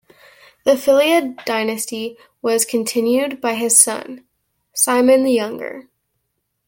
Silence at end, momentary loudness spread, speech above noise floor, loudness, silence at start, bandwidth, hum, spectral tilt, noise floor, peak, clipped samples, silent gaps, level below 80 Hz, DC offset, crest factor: 0.85 s; 17 LU; 56 dB; -16 LUFS; 0.65 s; 17 kHz; none; -2 dB/octave; -73 dBFS; 0 dBFS; under 0.1%; none; -64 dBFS; under 0.1%; 18 dB